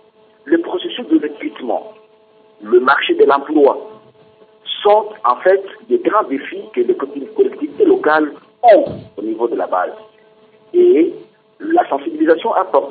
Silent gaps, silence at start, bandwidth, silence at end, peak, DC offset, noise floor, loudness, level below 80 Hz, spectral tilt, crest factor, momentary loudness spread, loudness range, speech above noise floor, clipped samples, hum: none; 0.45 s; 4.7 kHz; 0 s; 0 dBFS; under 0.1%; -49 dBFS; -15 LUFS; -66 dBFS; -10 dB/octave; 14 dB; 12 LU; 2 LU; 35 dB; under 0.1%; none